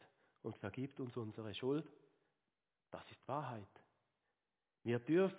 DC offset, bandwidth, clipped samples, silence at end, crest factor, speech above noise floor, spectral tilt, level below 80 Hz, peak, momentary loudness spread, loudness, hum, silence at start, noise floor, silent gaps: under 0.1%; 4 kHz; under 0.1%; 0 s; 20 dB; over 48 dB; -6 dB/octave; -80 dBFS; -24 dBFS; 16 LU; -44 LUFS; none; 0.45 s; under -90 dBFS; none